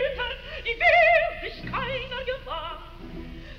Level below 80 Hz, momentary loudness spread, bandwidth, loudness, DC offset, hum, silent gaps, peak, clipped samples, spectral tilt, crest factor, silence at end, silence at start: -42 dBFS; 23 LU; 7 kHz; -24 LUFS; under 0.1%; none; none; -10 dBFS; under 0.1%; -5 dB/octave; 16 dB; 0 s; 0 s